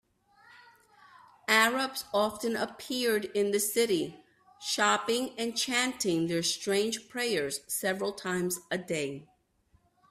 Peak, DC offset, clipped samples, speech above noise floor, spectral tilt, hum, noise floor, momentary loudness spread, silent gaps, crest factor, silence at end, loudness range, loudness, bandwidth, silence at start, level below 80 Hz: -8 dBFS; under 0.1%; under 0.1%; 38 dB; -2.5 dB/octave; none; -69 dBFS; 8 LU; none; 22 dB; 0.85 s; 3 LU; -29 LUFS; 16 kHz; 0.55 s; -72 dBFS